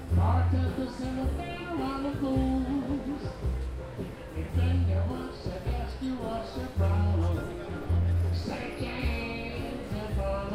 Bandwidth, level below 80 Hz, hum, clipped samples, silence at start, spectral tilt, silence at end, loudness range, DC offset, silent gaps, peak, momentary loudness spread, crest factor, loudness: 11.5 kHz; -36 dBFS; none; under 0.1%; 0 s; -8 dB/octave; 0 s; 2 LU; under 0.1%; none; -16 dBFS; 9 LU; 14 dB; -31 LUFS